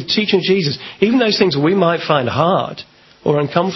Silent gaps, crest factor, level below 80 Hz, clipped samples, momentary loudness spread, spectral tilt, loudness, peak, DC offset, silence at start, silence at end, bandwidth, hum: none; 16 dB; -52 dBFS; under 0.1%; 7 LU; -6 dB/octave; -15 LUFS; 0 dBFS; under 0.1%; 0 s; 0 s; 6.2 kHz; none